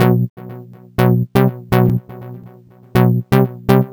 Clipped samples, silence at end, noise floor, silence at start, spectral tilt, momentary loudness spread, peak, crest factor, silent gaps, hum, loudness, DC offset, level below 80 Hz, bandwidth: under 0.1%; 0 s; -42 dBFS; 0 s; -8.5 dB/octave; 20 LU; 0 dBFS; 14 dB; 0.30-0.37 s; none; -16 LUFS; 0.2%; -40 dBFS; over 20 kHz